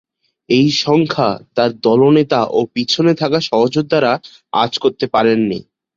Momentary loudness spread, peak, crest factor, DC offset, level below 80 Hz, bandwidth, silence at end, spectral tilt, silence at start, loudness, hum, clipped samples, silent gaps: 5 LU; -2 dBFS; 14 dB; under 0.1%; -54 dBFS; 7.6 kHz; 0.35 s; -6 dB/octave; 0.5 s; -15 LUFS; none; under 0.1%; none